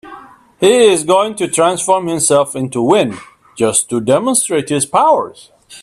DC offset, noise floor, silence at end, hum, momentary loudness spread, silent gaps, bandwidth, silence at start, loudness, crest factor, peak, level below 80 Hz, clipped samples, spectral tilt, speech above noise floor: under 0.1%; -37 dBFS; 0 s; none; 7 LU; none; 15 kHz; 0.05 s; -13 LUFS; 14 dB; 0 dBFS; -56 dBFS; under 0.1%; -3.5 dB/octave; 24 dB